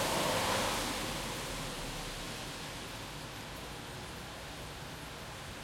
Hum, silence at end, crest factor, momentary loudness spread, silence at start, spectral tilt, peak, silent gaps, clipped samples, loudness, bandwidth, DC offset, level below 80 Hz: none; 0 s; 18 dB; 13 LU; 0 s; -3 dB/octave; -20 dBFS; none; under 0.1%; -38 LUFS; 16.5 kHz; under 0.1%; -52 dBFS